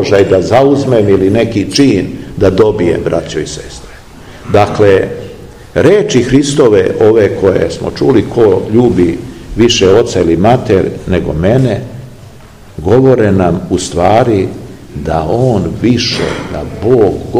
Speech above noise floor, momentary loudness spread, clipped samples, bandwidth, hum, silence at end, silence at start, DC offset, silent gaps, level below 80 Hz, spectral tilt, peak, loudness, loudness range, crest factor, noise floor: 25 dB; 12 LU; 2%; 14.5 kHz; none; 0 s; 0 s; 0.7%; none; -32 dBFS; -6 dB/octave; 0 dBFS; -10 LUFS; 3 LU; 10 dB; -34 dBFS